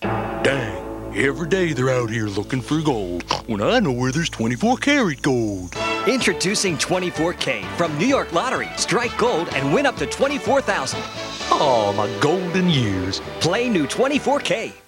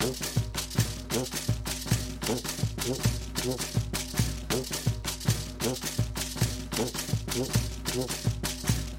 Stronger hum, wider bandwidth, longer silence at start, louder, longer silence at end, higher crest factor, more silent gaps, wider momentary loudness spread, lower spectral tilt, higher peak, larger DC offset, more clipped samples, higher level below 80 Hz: neither; about the same, 17 kHz vs 16.5 kHz; about the same, 0 s vs 0 s; first, -21 LUFS vs -30 LUFS; about the same, 0.1 s vs 0 s; about the same, 18 dB vs 18 dB; neither; first, 6 LU vs 3 LU; about the same, -4.5 dB/octave vs -4 dB/octave; first, -2 dBFS vs -12 dBFS; neither; neither; about the same, -44 dBFS vs -40 dBFS